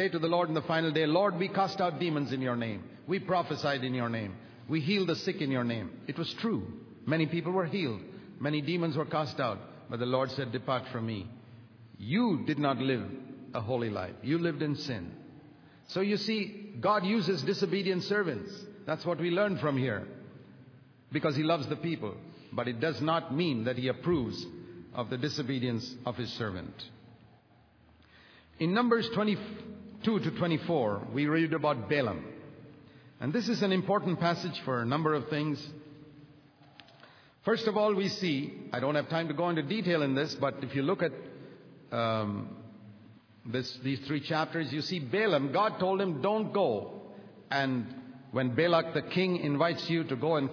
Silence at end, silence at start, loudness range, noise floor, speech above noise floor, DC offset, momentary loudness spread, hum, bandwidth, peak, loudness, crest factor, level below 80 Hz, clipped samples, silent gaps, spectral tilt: 0 s; 0 s; 4 LU; -62 dBFS; 31 dB; under 0.1%; 14 LU; none; 5.4 kHz; -12 dBFS; -31 LUFS; 20 dB; -70 dBFS; under 0.1%; none; -6.5 dB/octave